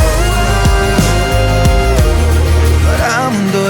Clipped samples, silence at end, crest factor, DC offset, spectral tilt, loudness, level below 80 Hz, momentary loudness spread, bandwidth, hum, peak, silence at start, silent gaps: under 0.1%; 0 s; 10 dB; under 0.1%; -5.5 dB/octave; -12 LUFS; -14 dBFS; 2 LU; over 20 kHz; none; 0 dBFS; 0 s; none